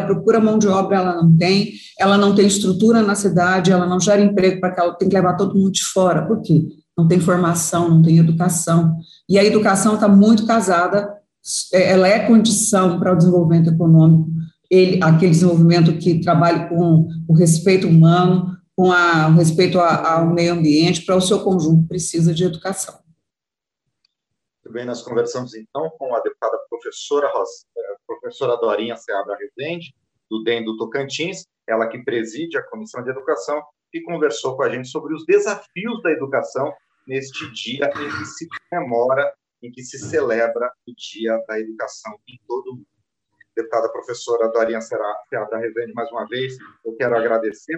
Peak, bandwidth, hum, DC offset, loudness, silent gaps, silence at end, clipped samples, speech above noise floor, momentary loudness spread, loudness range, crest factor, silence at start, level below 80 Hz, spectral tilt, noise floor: -2 dBFS; 12.5 kHz; none; under 0.1%; -17 LUFS; none; 0 s; under 0.1%; 71 dB; 16 LU; 11 LU; 14 dB; 0 s; -60 dBFS; -6 dB/octave; -87 dBFS